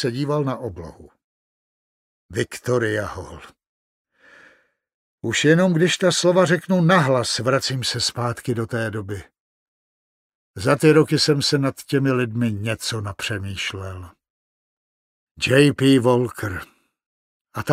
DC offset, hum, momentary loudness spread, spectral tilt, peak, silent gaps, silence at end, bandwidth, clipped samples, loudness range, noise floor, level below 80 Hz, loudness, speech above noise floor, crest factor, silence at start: under 0.1%; none; 16 LU; -5 dB/octave; -2 dBFS; 1.24-2.29 s, 3.69-4.05 s, 4.94-5.18 s, 9.40-10.54 s, 14.30-15.35 s, 17.06-17.45 s; 0 s; 16 kHz; under 0.1%; 10 LU; -57 dBFS; -54 dBFS; -20 LUFS; 37 dB; 20 dB; 0 s